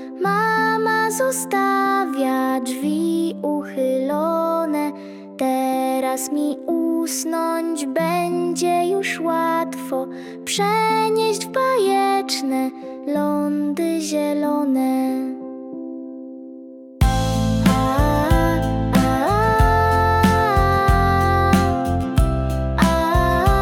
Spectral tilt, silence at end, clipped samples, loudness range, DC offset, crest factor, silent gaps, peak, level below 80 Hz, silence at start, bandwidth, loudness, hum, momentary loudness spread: -5.5 dB/octave; 0 s; under 0.1%; 5 LU; under 0.1%; 14 dB; none; -4 dBFS; -30 dBFS; 0 s; 18 kHz; -19 LUFS; none; 10 LU